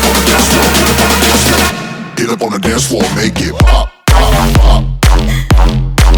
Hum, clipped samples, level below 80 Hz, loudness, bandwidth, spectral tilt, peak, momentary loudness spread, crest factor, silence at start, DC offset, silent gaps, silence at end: none; 0.5%; -12 dBFS; -10 LUFS; over 20 kHz; -4 dB/octave; 0 dBFS; 6 LU; 8 dB; 0 s; under 0.1%; none; 0 s